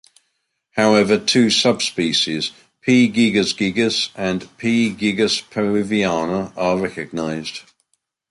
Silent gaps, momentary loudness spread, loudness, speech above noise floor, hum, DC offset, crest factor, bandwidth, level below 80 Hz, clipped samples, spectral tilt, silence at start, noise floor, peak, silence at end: none; 10 LU; -18 LUFS; 54 dB; none; under 0.1%; 18 dB; 11.5 kHz; -54 dBFS; under 0.1%; -4 dB/octave; 0.75 s; -72 dBFS; -2 dBFS; 0.7 s